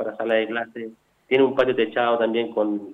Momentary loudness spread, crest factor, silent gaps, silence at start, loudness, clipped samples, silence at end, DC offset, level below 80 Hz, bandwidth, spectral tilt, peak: 12 LU; 16 dB; none; 0 s; -22 LUFS; under 0.1%; 0 s; under 0.1%; -66 dBFS; 5.4 kHz; -7 dB/octave; -8 dBFS